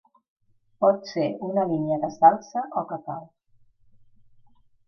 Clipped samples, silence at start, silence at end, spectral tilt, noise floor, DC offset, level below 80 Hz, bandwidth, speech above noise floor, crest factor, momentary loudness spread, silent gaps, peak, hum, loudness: under 0.1%; 0.8 s; 1.6 s; -7 dB/octave; -59 dBFS; under 0.1%; -72 dBFS; 6.6 kHz; 36 dB; 22 dB; 15 LU; none; -4 dBFS; none; -24 LUFS